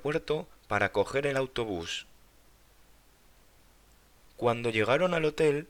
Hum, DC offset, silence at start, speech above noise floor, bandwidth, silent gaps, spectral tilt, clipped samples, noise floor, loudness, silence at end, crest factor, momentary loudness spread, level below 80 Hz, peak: none; under 0.1%; 0 s; 31 dB; 19 kHz; none; -5 dB/octave; under 0.1%; -60 dBFS; -29 LUFS; 0.05 s; 20 dB; 8 LU; -58 dBFS; -10 dBFS